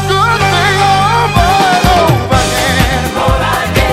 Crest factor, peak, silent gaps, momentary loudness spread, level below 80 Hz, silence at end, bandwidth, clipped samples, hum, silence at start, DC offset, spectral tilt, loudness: 10 dB; 0 dBFS; none; 3 LU; -20 dBFS; 0 s; 16.5 kHz; under 0.1%; none; 0 s; under 0.1%; -4.5 dB/octave; -10 LUFS